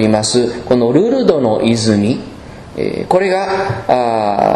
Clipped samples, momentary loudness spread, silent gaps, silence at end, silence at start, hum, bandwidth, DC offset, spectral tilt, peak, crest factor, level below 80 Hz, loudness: 0.1%; 10 LU; none; 0 s; 0 s; none; 11.5 kHz; under 0.1%; -5.5 dB/octave; 0 dBFS; 14 dB; -42 dBFS; -14 LUFS